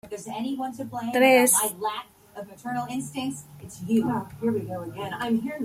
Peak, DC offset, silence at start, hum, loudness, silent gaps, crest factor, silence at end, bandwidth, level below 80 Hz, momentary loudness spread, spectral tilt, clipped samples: -6 dBFS; under 0.1%; 0.05 s; none; -25 LUFS; none; 20 dB; 0 s; 16.5 kHz; -64 dBFS; 21 LU; -3.5 dB/octave; under 0.1%